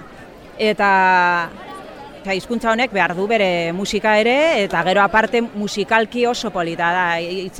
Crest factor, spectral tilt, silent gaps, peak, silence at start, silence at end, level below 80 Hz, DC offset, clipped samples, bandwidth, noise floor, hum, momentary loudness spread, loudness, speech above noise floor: 16 dB; -4.5 dB/octave; none; -2 dBFS; 0 s; 0 s; -48 dBFS; under 0.1%; under 0.1%; 16 kHz; -39 dBFS; none; 10 LU; -17 LUFS; 22 dB